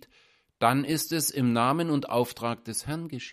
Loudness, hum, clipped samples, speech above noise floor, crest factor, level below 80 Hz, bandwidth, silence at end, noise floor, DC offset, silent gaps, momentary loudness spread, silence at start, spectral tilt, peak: -27 LUFS; none; under 0.1%; 36 dB; 22 dB; -62 dBFS; 15.5 kHz; 0 s; -63 dBFS; under 0.1%; none; 9 LU; 0.6 s; -4.5 dB/octave; -6 dBFS